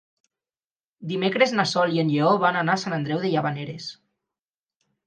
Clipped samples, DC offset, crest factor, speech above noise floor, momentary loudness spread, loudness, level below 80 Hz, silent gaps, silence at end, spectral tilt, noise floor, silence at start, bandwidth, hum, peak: under 0.1%; under 0.1%; 20 dB; over 67 dB; 14 LU; -23 LUFS; -72 dBFS; none; 1.15 s; -5.5 dB/octave; under -90 dBFS; 1 s; 9.4 kHz; none; -4 dBFS